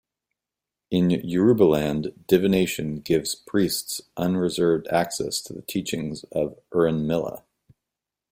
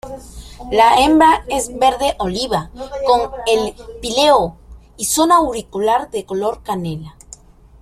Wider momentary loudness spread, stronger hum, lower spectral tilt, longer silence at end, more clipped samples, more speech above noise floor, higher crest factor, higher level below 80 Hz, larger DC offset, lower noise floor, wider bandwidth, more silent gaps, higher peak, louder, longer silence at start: second, 10 LU vs 16 LU; neither; first, -5.5 dB/octave vs -3.5 dB/octave; first, 0.95 s vs 0.7 s; neither; first, 65 dB vs 26 dB; about the same, 20 dB vs 16 dB; second, -54 dBFS vs -40 dBFS; neither; first, -88 dBFS vs -42 dBFS; about the same, 16.5 kHz vs 15.5 kHz; neither; second, -4 dBFS vs 0 dBFS; second, -24 LUFS vs -16 LUFS; first, 0.9 s vs 0.05 s